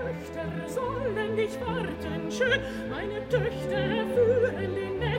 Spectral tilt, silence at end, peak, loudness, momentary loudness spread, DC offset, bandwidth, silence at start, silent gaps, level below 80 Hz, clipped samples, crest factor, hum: -6 dB/octave; 0 s; -14 dBFS; -29 LUFS; 9 LU; under 0.1%; 16 kHz; 0 s; none; -48 dBFS; under 0.1%; 14 dB; none